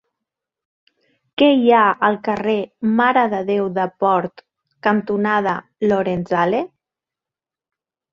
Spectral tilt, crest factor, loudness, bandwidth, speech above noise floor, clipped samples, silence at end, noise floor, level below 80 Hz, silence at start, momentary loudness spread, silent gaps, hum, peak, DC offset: -7.5 dB/octave; 18 dB; -18 LUFS; 7 kHz; 71 dB; under 0.1%; 1.45 s; -89 dBFS; -60 dBFS; 1.4 s; 9 LU; none; none; 0 dBFS; under 0.1%